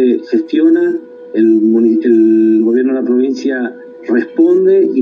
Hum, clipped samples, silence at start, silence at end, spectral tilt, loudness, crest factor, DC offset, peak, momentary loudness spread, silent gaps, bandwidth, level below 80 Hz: none; under 0.1%; 0 s; 0 s; -7.5 dB/octave; -11 LUFS; 10 dB; under 0.1%; 0 dBFS; 9 LU; none; 6.4 kHz; -76 dBFS